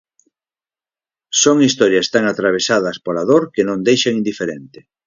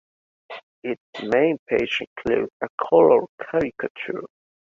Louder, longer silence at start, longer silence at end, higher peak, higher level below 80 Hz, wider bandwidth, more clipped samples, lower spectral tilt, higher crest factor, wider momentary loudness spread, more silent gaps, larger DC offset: first, -15 LUFS vs -22 LUFS; first, 1.3 s vs 0.5 s; second, 0.25 s vs 0.5 s; about the same, 0 dBFS vs -2 dBFS; about the same, -60 dBFS vs -56 dBFS; about the same, 7.6 kHz vs 7 kHz; neither; second, -3.5 dB/octave vs -6.5 dB/octave; about the same, 16 dB vs 20 dB; second, 9 LU vs 16 LU; second, none vs 0.63-0.82 s, 1.00-1.13 s, 1.59-1.66 s, 2.07-2.16 s, 2.53-2.60 s, 2.70-2.78 s, 3.29-3.38 s, 3.90-3.95 s; neither